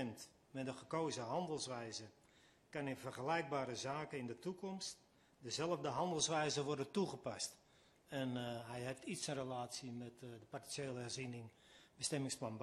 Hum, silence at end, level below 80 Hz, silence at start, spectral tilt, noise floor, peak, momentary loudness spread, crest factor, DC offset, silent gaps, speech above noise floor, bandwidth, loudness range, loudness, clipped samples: none; 0 s; -78 dBFS; 0 s; -4 dB/octave; -70 dBFS; -24 dBFS; 12 LU; 20 dB; under 0.1%; none; 27 dB; 13 kHz; 5 LU; -44 LUFS; under 0.1%